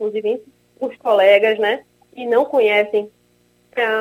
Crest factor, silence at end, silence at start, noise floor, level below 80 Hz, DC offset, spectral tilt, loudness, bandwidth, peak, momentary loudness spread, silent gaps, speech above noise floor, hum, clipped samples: 18 dB; 0 s; 0 s; -59 dBFS; -72 dBFS; under 0.1%; -4.5 dB/octave; -17 LUFS; 15.5 kHz; 0 dBFS; 16 LU; none; 42 dB; 60 Hz at -60 dBFS; under 0.1%